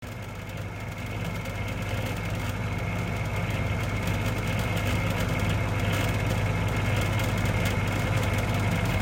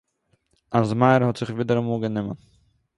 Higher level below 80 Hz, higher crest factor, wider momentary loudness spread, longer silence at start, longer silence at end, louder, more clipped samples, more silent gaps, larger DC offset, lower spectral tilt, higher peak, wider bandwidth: first, -38 dBFS vs -58 dBFS; second, 14 dB vs 20 dB; second, 7 LU vs 12 LU; second, 0 s vs 0.7 s; second, 0 s vs 0.6 s; second, -28 LUFS vs -22 LUFS; neither; neither; neither; second, -5.5 dB/octave vs -8 dB/octave; second, -12 dBFS vs -4 dBFS; first, 16.5 kHz vs 11 kHz